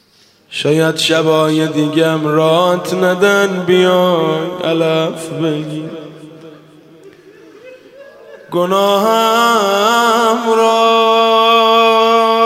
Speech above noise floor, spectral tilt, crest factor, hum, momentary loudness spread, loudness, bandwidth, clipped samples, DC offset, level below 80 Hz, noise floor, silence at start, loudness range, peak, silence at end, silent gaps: 38 dB; -4.5 dB/octave; 14 dB; none; 9 LU; -12 LUFS; 16 kHz; under 0.1%; under 0.1%; -64 dBFS; -50 dBFS; 0.5 s; 12 LU; 0 dBFS; 0 s; none